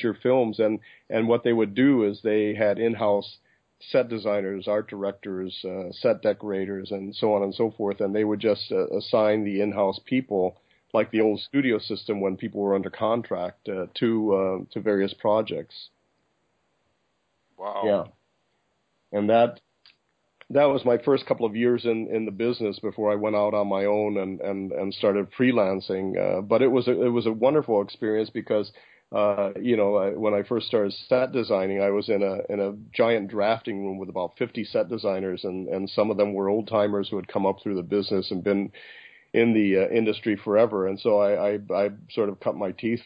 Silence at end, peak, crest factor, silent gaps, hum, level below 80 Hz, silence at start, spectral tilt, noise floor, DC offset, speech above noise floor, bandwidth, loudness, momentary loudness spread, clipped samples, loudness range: 0.05 s; -8 dBFS; 18 dB; none; none; -64 dBFS; 0 s; -9.5 dB/octave; -73 dBFS; under 0.1%; 49 dB; 5.2 kHz; -25 LUFS; 9 LU; under 0.1%; 5 LU